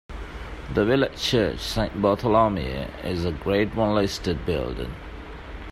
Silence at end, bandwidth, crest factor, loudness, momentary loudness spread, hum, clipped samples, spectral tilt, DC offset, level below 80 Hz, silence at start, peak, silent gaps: 0 s; 15.5 kHz; 18 dB; -24 LUFS; 17 LU; none; under 0.1%; -6 dB/octave; under 0.1%; -38 dBFS; 0.1 s; -6 dBFS; none